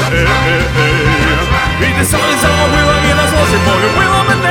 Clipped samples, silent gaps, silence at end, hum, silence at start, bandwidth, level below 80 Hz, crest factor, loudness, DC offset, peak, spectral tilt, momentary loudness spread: under 0.1%; none; 0 s; none; 0 s; 19 kHz; -22 dBFS; 10 dB; -10 LUFS; under 0.1%; 0 dBFS; -4.5 dB/octave; 2 LU